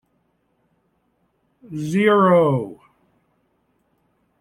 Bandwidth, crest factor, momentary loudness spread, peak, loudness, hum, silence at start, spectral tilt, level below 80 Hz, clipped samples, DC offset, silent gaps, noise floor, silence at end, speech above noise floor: 13 kHz; 18 dB; 20 LU; -4 dBFS; -17 LUFS; none; 1.7 s; -7.5 dB/octave; -64 dBFS; under 0.1%; under 0.1%; none; -67 dBFS; 1.65 s; 50 dB